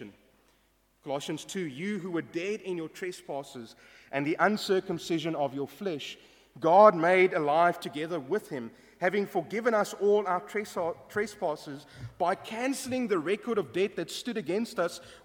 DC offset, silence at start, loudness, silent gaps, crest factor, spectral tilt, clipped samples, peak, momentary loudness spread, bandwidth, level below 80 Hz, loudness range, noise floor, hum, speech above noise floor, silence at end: under 0.1%; 0 s; -29 LUFS; none; 24 dB; -5 dB/octave; under 0.1%; -6 dBFS; 15 LU; 18 kHz; -70 dBFS; 10 LU; -68 dBFS; none; 39 dB; 0.1 s